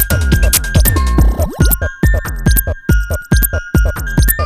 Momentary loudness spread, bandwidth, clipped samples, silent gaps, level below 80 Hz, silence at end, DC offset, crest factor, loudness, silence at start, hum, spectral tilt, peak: 4 LU; 15.5 kHz; under 0.1%; none; -14 dBFS; 0 s; under 0.1%; 12 dB; -14 LUFS; 0 s; none; -4.5 dB/octave; 0 dBFS